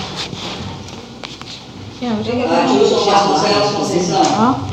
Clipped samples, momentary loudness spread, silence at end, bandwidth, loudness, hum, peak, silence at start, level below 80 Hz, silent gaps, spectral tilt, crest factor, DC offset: under 0.1%; 18 LU; 0 s; 12.5 kHz; -15 LUFS; none; 0 dBFS; 0 s; -46 dBFS; none; -4.5 dB/octave; 16 dB; under 0.1%